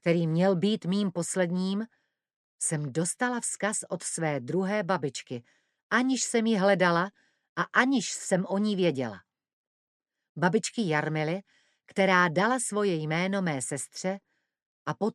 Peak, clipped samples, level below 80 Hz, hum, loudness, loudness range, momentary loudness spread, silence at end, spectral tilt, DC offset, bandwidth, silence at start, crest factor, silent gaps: -8 dBFS; under 0.1%; -76 dBFS; none; -28 LUFS; 4 LU; 11 LU; 0.05 s; -4.5 dB/octave; under 0.1%; 13 kHz; 0.05 s; 22 dB; 2.36-2.59 s, 5.83-5.90 s, 7.49-7.56 s, 9.53-10.00 s, 10.29-10.35 s, 14.62-14.86 s